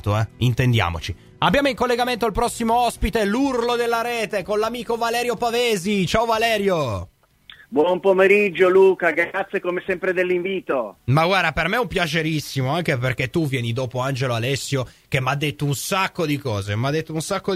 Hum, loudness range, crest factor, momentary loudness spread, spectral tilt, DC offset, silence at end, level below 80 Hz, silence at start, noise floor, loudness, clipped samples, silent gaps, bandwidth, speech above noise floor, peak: none; 5 LU; 18 dB; 8 LU; -5.5 dB/octave; under 0.1%; 0 s; -42 dBFS; 0.05 s; -48 dBFS; -21 LUFS; under 0.1%; none; 16 kHz; 28 dB; -4 dBFS